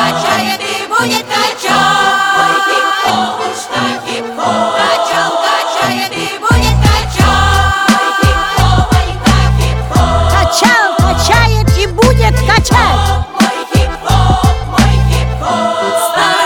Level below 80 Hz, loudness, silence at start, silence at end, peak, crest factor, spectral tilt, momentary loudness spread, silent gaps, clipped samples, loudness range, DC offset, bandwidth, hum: -18 dBFS; -11 LUFS; 0 s; 0 s; 0 dBFS; 10 dB; -4.5 dB/octave; 6 LU; none; under 0.1%; 3 LU; under 0.1%; 19 kHz; none